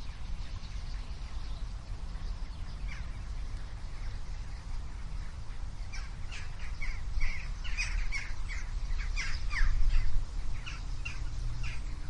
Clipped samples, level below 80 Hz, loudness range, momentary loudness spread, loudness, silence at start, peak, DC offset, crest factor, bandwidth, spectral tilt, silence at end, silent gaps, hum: under 0.1%; -34 dBFS; 7 LU; 9 LU; -40 LUFS; 0 s; -14 dBFS; under 0.1%; 18 dB; 9.2 kHz; -4 dB/octave; 0 s; none; none